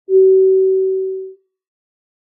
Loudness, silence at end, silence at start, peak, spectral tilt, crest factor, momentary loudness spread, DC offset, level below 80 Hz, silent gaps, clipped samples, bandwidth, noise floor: -13 LUFS; 0.9 s; 0.1 s; -4 dBFS; -14.5 dB/octave; 10 dB; 14 LU; under 0.1%; under -90 dBFS; none; under 0.1%; 0.5 kHz; -33 dBFS